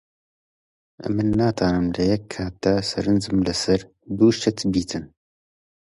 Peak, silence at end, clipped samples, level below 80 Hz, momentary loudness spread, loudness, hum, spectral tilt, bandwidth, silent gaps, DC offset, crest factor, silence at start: -6 dBFS; 0.9 s; under 0.1%; -44 dBFS; 11 LU; -22 LUFS; none; -6 dB/octave; 11.5 kHz; none; under 0.1%; 18 dB; 1 s